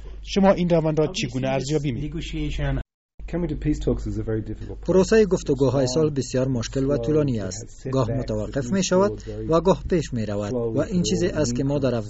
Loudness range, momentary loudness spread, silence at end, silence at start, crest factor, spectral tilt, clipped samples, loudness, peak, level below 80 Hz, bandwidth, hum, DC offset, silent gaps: 5 LU; 10 LU; 0 s; 0 s; 16 dB; -6.5 dB/octave; under 0.1%; -23 LUFS; -6 dBFS; -36 dBFS; 8 kHz; none; under 0.1%; 2.94-3.18 s